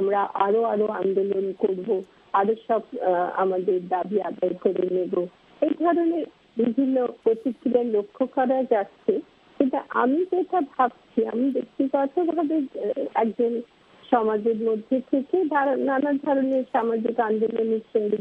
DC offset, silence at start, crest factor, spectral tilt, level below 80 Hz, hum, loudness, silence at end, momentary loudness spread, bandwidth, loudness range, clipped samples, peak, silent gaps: under 0.1%; 0 s; 18 dB; -9 dB/octave; -72 dBFS; none; -24 LUFS; 0 s; 5 LU; 4.7 kHz; 1 LU; under 0.1%; -6 dBFS; none